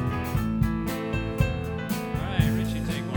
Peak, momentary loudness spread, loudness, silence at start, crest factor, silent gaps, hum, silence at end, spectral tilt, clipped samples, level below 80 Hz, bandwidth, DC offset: -8 dBFS; 5 LU; -27 LUFS; 0 s; 18 dB; none; none; 0 s; -6.5 dB/octave; under 0.1%; -36 dBFS; 19 kHz; under 0.1%